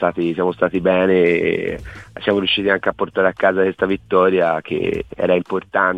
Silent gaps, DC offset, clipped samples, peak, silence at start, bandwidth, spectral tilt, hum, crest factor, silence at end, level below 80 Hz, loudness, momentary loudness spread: none; under 0.1%; under 0.1%; -2 dBFS; 0 s; 8.4 kHz; -7 dB/octave; none; 16 dB; 0 s; -46 dBFS; -18 LUFS; 8 LU